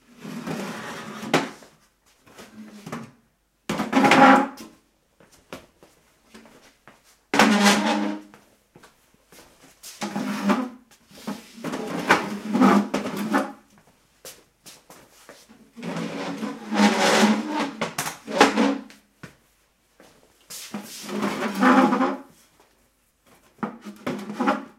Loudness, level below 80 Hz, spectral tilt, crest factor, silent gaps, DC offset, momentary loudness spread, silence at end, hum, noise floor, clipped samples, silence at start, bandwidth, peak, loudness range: -22 LUFS; -66 dBFS; -4 dB/octave; 26 dB; none; under 0.1%; 22 LU; 0.1 s; none; -66 dBFS; under 0.1%; 0.2 s; 16 kHz; 0 dBFS; 10 LU